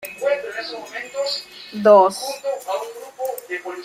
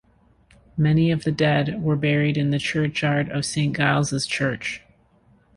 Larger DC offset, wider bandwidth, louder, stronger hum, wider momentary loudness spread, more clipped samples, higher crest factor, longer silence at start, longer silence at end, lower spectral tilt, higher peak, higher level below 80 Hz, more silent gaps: neither; first, 16 kHz vs 11.5 kHz; about the same, -21 LUFS vs -22 LUFS; neither; first, 17 LU vs 5 LU; neither; about the same, 18 dB vs 20 dB; second, 0 s vs 0.75 s; second, 0 s vs 0.8 s; second, -3.5 dB/octave vs -5.5 dB/octave; about the same, -2 dBFS vs -4 dBFS; second, -68 dBFS vs -52 dBFS; neither